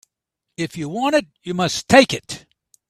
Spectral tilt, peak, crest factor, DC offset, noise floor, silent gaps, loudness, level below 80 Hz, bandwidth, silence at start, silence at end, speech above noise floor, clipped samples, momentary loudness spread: -4 dB/octave; 0 dBFS; 20 dB; under 0.1%; -81 dBFS; none; -19 LUFS; -52 dBFS; 14.5 kHz; 0.6 s; 0.5 s; 62 dB; under 0.1%; 15 LU